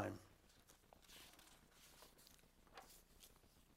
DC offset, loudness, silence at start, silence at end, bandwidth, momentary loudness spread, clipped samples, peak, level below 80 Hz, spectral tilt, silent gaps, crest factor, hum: under 0.1%; -62 LUFS; 0 s; 0 s; 16 kHz; 8 LU; under 0.1%; -32 dBFS; -76 dBFS; -4.5 dB/octave; none; 28 dB; none